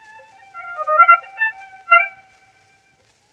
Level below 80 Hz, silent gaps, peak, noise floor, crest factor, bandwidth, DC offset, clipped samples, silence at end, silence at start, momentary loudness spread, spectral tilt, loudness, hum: -76 dBFS; none; 0 dBFS; -58 dBFS; 18 dB; 6.6 kHz; under 0.1%; under 0.1%; 1.25 s; 0.55 s; 22 LU; -0.5 dB/octave; -14 LUFS; none